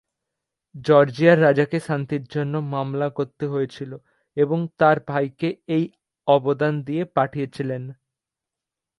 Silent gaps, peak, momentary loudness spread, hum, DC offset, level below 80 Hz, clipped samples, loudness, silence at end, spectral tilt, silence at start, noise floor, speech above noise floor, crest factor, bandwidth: none; -2 dBFS; 14 LU; none; under 0.1%; -64 dBFS; under 0.1%; -22 LUFS; 1.05 s; -8 dB/octave; 0.75 s; -87 dBFS; 66 dB; 20 dB; 11.5 kHz